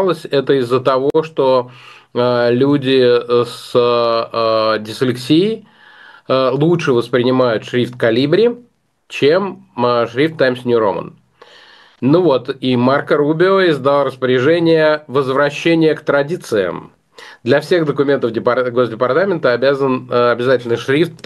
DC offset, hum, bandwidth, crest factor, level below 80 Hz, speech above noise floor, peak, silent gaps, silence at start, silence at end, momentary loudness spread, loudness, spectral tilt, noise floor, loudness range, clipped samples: under 0.1%; none; 12.5 kHz; 14 dB; -62 dBFS; 30 dB; 0 dBFS; none; 0 s; 0.15 s; 6 LU; -15 LUFS; -6.5 dB/octave; -44 dBFS; 3 LU; under 0.1%